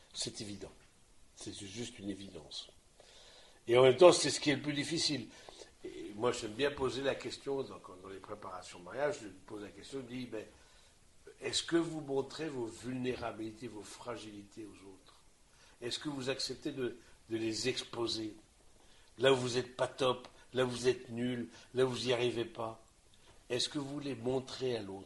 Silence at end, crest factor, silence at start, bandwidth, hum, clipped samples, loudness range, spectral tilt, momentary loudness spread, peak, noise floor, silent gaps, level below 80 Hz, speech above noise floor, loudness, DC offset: 0 s; 28 dB; 0.15 s; 11.5 kHz; none; under 0.1%; 13 LU; -4 dB/octave; 18 LU; -8 dBFS; -63 dBFS; none; -66 dBFS; 28 dB; -35 LUFS; under 0.1%